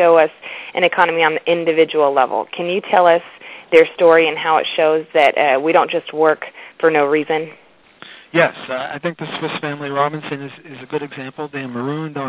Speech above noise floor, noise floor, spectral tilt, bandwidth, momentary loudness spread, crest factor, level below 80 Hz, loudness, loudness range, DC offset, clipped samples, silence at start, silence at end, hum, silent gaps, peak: 26 dB; -42 dBFS; -8.5 dB/octave; 4 kHz; 14 LU; 16 dB; -66 dBFS; -16 LUFS; 7 LU; under 0.1%; under 0.1%; 0 s; 0 s; none; none; 0 dBFS